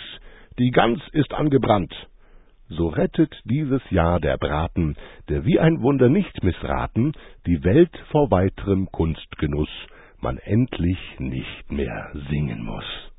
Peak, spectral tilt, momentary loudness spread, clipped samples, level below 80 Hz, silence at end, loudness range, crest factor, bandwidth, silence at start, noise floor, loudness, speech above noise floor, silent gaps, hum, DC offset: -4 dBFS; -12 dB/octave; 13 LU; under 0.1%; -36 dBFS; 0.05 s; 6 LU; 18 dB; 4 kHz; 0 s; -49 dBFS; -22 LUFS; 28 dB; none; none; under 0.1%